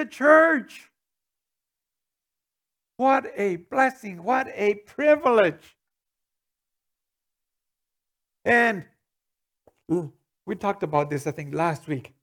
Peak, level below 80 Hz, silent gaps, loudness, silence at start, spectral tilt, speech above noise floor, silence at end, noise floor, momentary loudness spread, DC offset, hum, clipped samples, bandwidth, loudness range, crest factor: -2 dBFS; -70 dBFS; none; -23 LUFS; 0 s; -6 dB/octave; 65 dB; 0.2 s; -87 dBFS; 15 LU; under 0.1%; none; under 0.1%; 15.5 kHz; 6 LU; 24 dB